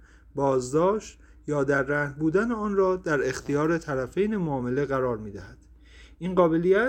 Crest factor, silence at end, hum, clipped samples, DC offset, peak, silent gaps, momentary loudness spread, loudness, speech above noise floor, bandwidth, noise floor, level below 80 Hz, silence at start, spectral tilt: 18 dB; 0 s; none; under 0.1%; under 0.1%; -8 dBFS; none; 11 LU; -26 LUFS; 25 dB; 9.6 kHz; -50 dBFS; -50 dBFS; 0.35 s; -6.5 dB/octave